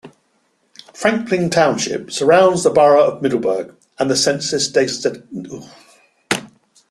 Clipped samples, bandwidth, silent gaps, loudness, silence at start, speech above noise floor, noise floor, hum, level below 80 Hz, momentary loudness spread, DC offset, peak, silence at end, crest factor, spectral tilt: under 0.1%; 13 kHz; none; -16 LUFS; 0.05 s; 47 dB; -63 dBFS; none; -58 dBFS; 17 LU; under 0.1%; 0 dBFS; 0.45 s; 18 dB; -3.5 dB/octave